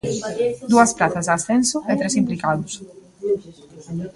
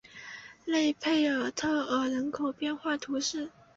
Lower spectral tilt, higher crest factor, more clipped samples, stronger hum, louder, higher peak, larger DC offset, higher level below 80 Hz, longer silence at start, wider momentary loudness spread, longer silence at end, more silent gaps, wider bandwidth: first, -4.5 dB/octave vs -2.5 dB/octave; first, 20 dB vs 14 dB; neither; neither; first, -20 LUFS vs -30 LUFS; first, -2 dBFS vs -18 dBFS; neither; first, -56 dBFS vs -68 dBFS; about the same, 0.05 s vs 0.15 s; about the same, 15 LU vs 13 LU; second, 0.05 s vs 0.25 s; neither; first, 11.5 kHz vs 8 kHz